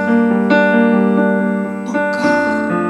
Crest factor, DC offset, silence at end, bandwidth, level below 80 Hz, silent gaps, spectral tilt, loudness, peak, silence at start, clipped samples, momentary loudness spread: 14 dB; under 0.1%; 0 s; 10 kHz; -58 dBFS; none; -7 dB/octave; -14 LUFS; 0 dBFS; 0 s; under 0.1%; 7 LU